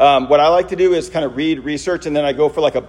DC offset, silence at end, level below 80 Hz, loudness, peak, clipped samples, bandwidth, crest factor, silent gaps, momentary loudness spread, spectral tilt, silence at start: under 0.1%; 0 s; -44 dBFS; -16 LUFS; 0 dBFS; under 0.1%; 11 kHz; 14 dB; none; 9 LU; -5 dB/octave; 0 s